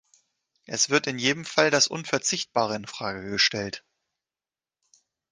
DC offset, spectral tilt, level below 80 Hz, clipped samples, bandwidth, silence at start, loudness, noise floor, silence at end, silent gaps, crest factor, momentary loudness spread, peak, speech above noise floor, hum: under 0.1%; -2 dB/octave; -64 dBFS; under 0.1%; 10.5 kHz; 0.7 s; -24 LUFS; under -90 dBFS; 1.5 s; none; 24 dB; 11 LU; -4 dBFS; over 64 dB; none